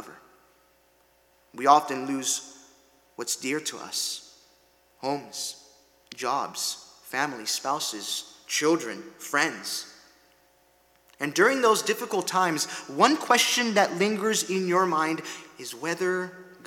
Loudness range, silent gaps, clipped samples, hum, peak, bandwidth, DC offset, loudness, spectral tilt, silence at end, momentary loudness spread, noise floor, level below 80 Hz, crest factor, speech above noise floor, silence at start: 9 LU; none; under 0.1%; none; -4 dBFS; 18.5 kHz; under 0.1%; -26 LUFS; -2.5 dB/octave; 0.1 s; 16 LU; -63 dBFS; -76 dBFS; 24 dB; 37 dB; 0 s